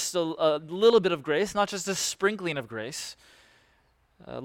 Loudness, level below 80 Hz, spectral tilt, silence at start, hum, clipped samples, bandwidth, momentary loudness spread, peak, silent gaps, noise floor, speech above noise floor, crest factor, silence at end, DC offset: -26 LUFS; -64 dBFS; -3.5 dB/octave; 0 s; none; under 0.1%; 16.5 kHz; 14 LU; -10 dBFS; none; -66 dBFS; 40 dB; 18 dB; 0 s; under 0.1%